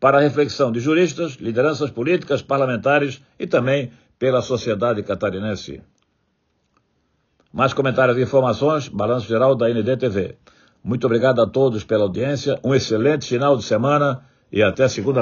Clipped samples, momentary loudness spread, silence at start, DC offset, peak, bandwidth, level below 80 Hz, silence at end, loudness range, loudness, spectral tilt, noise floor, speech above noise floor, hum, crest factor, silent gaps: under 0.1%; 9 LU; 0 s; under 0.1%; -2 dBFS; 7.2 kHz; -56 dBFS; 0 s; 5 LU; -19 LUFS; -5.5 dB/octave; -68 dBFS; 49 dB; none; 18 dB; none